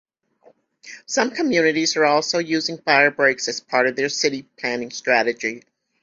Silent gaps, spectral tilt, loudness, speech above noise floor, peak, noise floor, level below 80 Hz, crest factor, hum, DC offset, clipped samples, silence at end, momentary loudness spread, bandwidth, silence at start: none; -2.5 dB/octave; -20 LUFS; 36 dB; -2 dBFS; -56 dBFS; -66 dBFS; 20 dB; none; under 0.1%; under 0.1%; 0.45 s; 11 LU; 7.8 kHz; 0.85 s